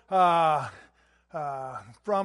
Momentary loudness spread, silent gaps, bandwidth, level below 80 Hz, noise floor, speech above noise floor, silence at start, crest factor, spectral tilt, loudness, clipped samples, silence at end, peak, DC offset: 18 LU; none; 11.5 kHz; -70 dBFS; -61 dBFS; 35 dB; 0.1 s; 16 dB; -5.5 dB/octave; -26 LUFS; under 0.1%; 0 s; -10 dBFS; under 0.1%